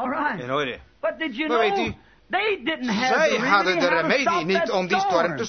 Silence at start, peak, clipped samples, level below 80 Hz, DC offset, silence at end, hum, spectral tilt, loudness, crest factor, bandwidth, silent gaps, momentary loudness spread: 0 s; -4 dBFS; under 0.1%; -56 dBFS; under 0.1%; 0 s; none; -4 dB/octave; -22 LUFS; 18 dB; 6.6 kHz; none; 8 LU